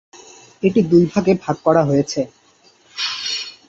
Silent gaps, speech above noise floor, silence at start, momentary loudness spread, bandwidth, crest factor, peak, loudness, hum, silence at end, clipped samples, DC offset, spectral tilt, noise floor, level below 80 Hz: none; 38 dB; 0.6 s; 10 LU; 8 kHz; 16 dB; -2 dBFS; -18 LUFS; none; 0.2 s; under 0.1%; under 0.1%; -6 dB/octave; -53 dBFS; -54 dBFS